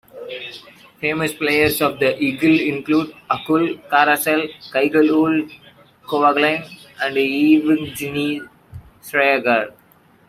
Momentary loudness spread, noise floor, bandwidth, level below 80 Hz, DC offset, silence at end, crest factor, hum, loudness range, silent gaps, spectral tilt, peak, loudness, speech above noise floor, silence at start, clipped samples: 16 LU; -53 dBFS; 16 kHz; -56 dBFS; under 0.1%; 0.6 s; 16 dB; none; 2 LU; none; -4.5 dB/octave; -2 dBFS; -18 LUFS; 35 dB; 0.15 s; under 0.1%